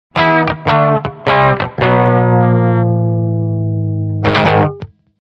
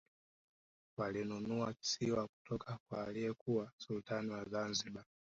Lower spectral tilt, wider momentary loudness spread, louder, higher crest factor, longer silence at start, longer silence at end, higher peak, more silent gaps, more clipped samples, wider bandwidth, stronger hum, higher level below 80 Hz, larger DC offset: first, -8.5 dB/octave vs -4.5 dB/octave; about the same, 6 LU vs 7 LU; first, -13 LUFS vs -41 LUFS; second, 12 dB vs 18 dB; second, 0.15 s vs 1 s; first, 0.45 s vs 0.25 s; first, 0 dBFS vs -24 dBFS; second, none vs 2.29-2.45 s, 2.80-2.86 s, 3.41-3.46 s, 3.73-3.78 s; neither; second, 6 kHz vs 7.6 kHz; neither; first, -42 dBFS vs -72 dBFS; neither